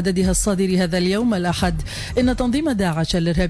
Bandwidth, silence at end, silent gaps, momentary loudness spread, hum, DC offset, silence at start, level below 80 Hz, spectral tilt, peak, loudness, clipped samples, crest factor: 11 kHz; 0 s; none; 3 LU; none; under 0.1%; 0 s; -30 dBFS; -5 dB/octave; -8 dBFS; -20 LUFS; under 0.1%; 12 dB